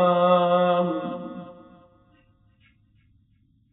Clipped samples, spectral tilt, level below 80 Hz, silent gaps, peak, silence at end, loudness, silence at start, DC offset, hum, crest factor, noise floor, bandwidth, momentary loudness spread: under 0.1%; -5.5 dB/octave; -68 dBFS; none; -8 dBFS; 2.2 s; -22 LUFS; 0 s; under 0.1%; none; 16 dB; -63 dBFS; 4 kHz; 21 LU